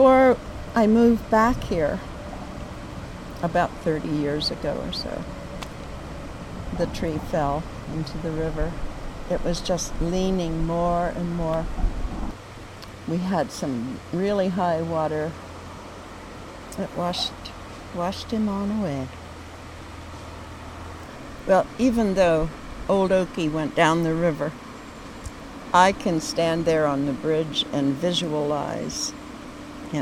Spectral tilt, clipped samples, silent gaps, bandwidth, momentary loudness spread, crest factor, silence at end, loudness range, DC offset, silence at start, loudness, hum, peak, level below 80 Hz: -5.5 dB/octave; under 0.1%; none; 16 kHz; 19 LU; 22 dB; 0 s; 7 LU; under 0.1%; 0 s; -24 LUFS; none; -2 dBFS; -38 dBFS